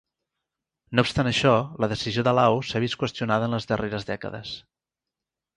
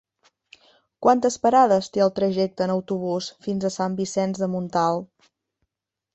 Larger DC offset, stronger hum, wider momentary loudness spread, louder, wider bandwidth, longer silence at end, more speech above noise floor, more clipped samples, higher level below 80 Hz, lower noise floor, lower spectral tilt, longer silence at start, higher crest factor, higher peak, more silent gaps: neither; neither; first, 12 LU vs 9 LU; about the same, -24 LUFS vs -22 LUFS; first, 11 kHz vs 8.4 kHz; second, 0.95 s vs 1.1 s; about the same, 64 dB vs 61 dB; neither; first, -52 dBFS vs -64 dBFS; first, -88 dBFS vs -83 dBFS; about the same, -5.5 dB/octave vs -5.5 dB/octave; about the same, 0.9 s vs 1 s; about the same, 22 dB vs 20 dB; about the same, -4 dBFS vs -4 dBFS; neither